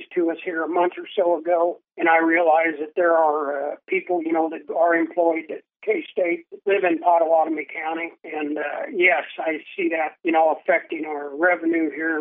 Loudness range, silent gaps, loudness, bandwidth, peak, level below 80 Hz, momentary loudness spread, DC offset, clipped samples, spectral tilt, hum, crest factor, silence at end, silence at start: 3 LU; none; -22 LUFS; 3.8 kHz; -4 dBFS; under -90 dBFS; 10 LU; under 0.1%; under 0.1%; -8.5 dB/octave; none; 18 dB; 0 s; 0 s